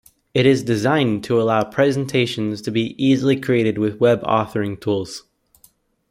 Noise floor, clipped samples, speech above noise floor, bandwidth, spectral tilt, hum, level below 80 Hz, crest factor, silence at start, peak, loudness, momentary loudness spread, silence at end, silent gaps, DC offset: -56 dBFS; under 0.1%; 38 dB; 15.5 kHz; -6.5 dB/octave; none; -56 dBFS; 16 dB; 0.35 s; -4 dBFS; -19 LUFS; 8 LU; 0.9 s; none; under 0.1%